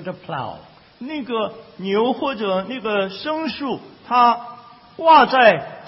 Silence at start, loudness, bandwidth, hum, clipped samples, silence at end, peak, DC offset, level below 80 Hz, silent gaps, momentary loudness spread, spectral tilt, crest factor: 0 s; -18 LUFS; 5.8 kHz; none; under 0.1%; 0 s; 0 dBFS; under 0.1%; -60 dBFS; none; 18 LU; -9 dB/octave; 18 dB